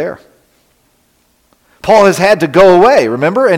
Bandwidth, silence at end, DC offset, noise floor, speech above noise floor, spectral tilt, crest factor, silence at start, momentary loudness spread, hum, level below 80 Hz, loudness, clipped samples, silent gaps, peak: 16 kHz; 0 s; under 0.1%; -55 dBFS; 47 dB; -5.5 dB/octave; 10 dB; 0 s; 10 LU; none; -44 dBFS; -8 LUFS; under 0.1%; none; 0 dBFS